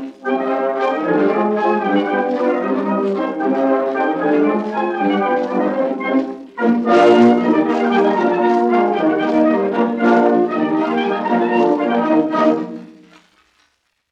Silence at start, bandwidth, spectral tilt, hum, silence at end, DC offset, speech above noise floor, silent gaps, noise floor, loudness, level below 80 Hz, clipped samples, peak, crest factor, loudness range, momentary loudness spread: 0 s; 8.2 kHz; -7 dB/octave; none; 1.2 s; under 0.1%; 48 dB; none; -63 dBFS; -16 LUFS; -66 dBFS; under 0.1%; 0 dBFS; 16 dB; 3 LU; 6 LU